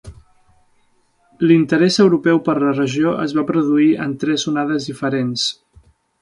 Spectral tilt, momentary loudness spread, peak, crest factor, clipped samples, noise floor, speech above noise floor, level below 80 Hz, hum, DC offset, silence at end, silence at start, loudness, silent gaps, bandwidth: -5.5 dB/octave; 8 LU; -2 dBFS; 16 dB; under 0.1%; -59 dBFS; 43 dB; -54 dBFS; none; under 0.1%; 0.7 s; 0.05 s; -17 LUFS; none; 11 kHz